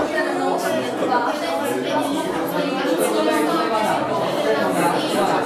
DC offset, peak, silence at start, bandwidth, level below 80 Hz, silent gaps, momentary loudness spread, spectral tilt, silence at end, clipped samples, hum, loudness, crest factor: under 0.1%; -6 dBFS; 0 s; 16 kHz; -60 dBFS; none; 4 LU; -4.5 dB/octave; 0 s; under 0.1%; none; -20 LUFS; 14 dB